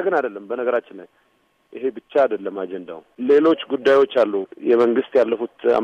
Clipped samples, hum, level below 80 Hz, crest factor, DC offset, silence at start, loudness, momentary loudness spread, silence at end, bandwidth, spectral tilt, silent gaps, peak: under 0.1%; none; -68 dBFS; 14 dB; under 0.1%; 0 s; -20 LUFS; 12 LU; 0 s; 7.4 kHz; -6 dB/octave; none; -6 dBFS